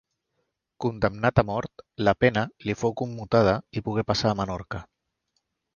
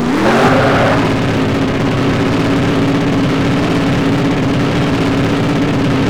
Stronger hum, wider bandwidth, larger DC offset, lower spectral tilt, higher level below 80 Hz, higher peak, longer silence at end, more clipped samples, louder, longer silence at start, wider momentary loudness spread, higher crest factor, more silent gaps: neither; second, 7.2 kHz vs 14.5 kHz; second, under 0.1% vs 2%; about the same, -6.5 dB/octave vs -6.5 dB/octave; second, -48 dBFS vs -32 dBFS; second, -4 dBFS vs 0 dBFS; first, 0.9 s vs 0 s; neither; second, -25 LUFS vs -13 LUFS; first, 0.8 s vs 0 s; first, 11 LU vs 4 LU; first, 22 dB vs 12 dB; neither